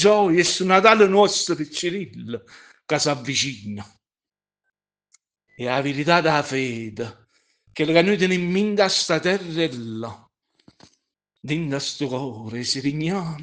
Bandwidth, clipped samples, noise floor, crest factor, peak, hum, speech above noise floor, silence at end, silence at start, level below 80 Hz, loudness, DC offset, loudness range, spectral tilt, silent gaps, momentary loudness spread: 10 kHz; under 0.1%; under -90 dBFS; 22 dB; 0 dBFS; none; over 69 dB; 0 s; 0 s; -62 dBFS; -21 LUFS; under 0.1%; 8 LU; -4 dB/octave; none; 18 LU